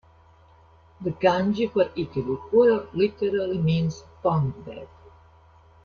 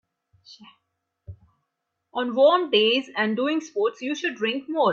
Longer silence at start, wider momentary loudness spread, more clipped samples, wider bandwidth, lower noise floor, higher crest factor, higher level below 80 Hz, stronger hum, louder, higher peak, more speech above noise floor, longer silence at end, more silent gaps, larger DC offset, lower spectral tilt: first, 1 s vs 0.5 s; first, 13 LU vs 9 LU; neither; second, 6.8 kHz vs 7.6 kHz; second, -55 dBFS vs -80 dBFS; about the same, 18 dB vs 18 dB; first, -54 dBFS vs -66 dBFS; neither; about the same, -24 LUFS vs -23 LUFS; about the same, -6 dBFS vs -6 dBFS; second, 31 dB vs 57 dB; first, 1 s vs 0 s; neither; neither; first, -8 dB/octave vs -4 dB/octave